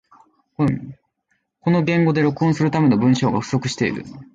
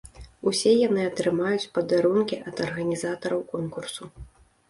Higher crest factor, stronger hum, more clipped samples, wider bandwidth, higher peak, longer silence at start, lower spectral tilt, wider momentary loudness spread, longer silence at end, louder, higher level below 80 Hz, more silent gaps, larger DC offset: about the same, 14 dB vs 16 dB; neither; neither; second, 9 kHz vs 11.5 kHz; first, -4 dBFS vs -8 dBFS; first, 0.6 s vs 0.05 s; first, -7 dB/octave vs -5 dB/octave; second, 9 LU vs 12 LU; second, 0.1 s vs 0.45 s; first, -19 LUFS vs -25 LUFS; about the same, -54 dBFS vs -54 dBFS; neither; neither